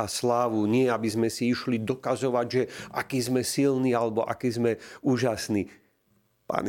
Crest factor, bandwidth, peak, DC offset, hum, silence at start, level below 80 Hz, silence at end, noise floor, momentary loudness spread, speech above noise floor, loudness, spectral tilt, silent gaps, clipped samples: 18 dB; 17 kHz; -8 dBFS; under 0.1%; none; 0 s; -64 dBFS; 0 s; -68 dBFS; 6 LU; 42 dB; -27 LUFS; -5.5 dB/octave; none; under 0.1%